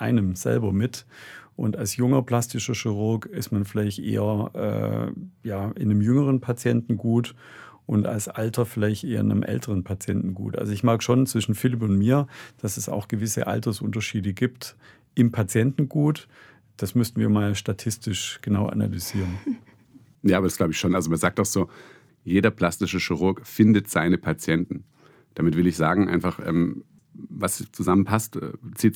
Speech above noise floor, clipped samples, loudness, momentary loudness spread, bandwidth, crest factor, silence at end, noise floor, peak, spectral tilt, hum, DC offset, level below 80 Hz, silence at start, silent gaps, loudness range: 30 dB; under 0.1%; -24 LUFS; 11 LU; 18.5 kHz; 20 dB; 0 s; -53 dBFS; -4 dBFS; -6 dB/octave; none; under 0.1%; -60 dBFS; 0 s; none; 3 LU